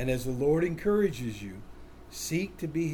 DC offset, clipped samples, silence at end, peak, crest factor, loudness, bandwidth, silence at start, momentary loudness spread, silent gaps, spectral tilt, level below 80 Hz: under 0.1%; under 0.1%; 0 s; -14 dBFS; 16 dB; -30 LUFS; 18 kHz; 0 s; 16 LU; none; -6 dB/octave; -48 dBFS